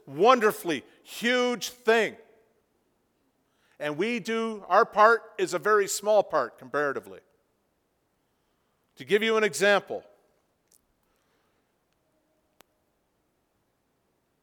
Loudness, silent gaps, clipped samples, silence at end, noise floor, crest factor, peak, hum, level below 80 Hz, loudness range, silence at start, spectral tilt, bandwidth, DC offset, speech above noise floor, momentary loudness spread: -25 LUFS; none; under 0.1%; 4.4 s; -74 dBFS; 24 dB; -4 dBFS; none; -78 dBFS; 6 LU; 0.05 s; -3 dB/octave; 19.5 kHz; under 0.1%; 49 dB; 12 LU